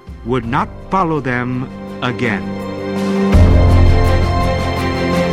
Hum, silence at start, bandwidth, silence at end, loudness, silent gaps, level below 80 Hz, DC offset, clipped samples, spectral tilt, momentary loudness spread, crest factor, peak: none; 0.05 s; 11.5 kHz; 0 s; -16 LUFS; none; -20 dBFS; under 0.1%; under 0.1%; -7.5 dB/octave; 11 LU; 14 dB; 0 dBFS